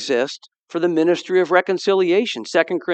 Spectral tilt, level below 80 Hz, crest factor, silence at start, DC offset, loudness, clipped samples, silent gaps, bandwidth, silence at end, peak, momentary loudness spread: -4.5 dB/octave; -82 dBFS; 18 dB; 0 s; under 0.1%; -19 LUFS; under 0.1%; 0.59-0.66 s; 8.6 kHz; 0 s; 0 dBFS; 8 LU